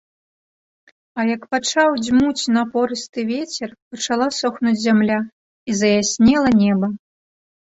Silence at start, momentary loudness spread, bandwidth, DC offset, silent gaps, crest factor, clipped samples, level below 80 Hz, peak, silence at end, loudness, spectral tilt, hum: 1.15 s; 13 LU; 8 kHz; under 0.1%; 3.09-3.13 s, 3.82-3.91 s, 5.32-5.66 s; 16 dB; under 0.1%; -52 dBFS; -4 dBFS; 0.7 s; -18 LUFS; -4.5 dB/octave; none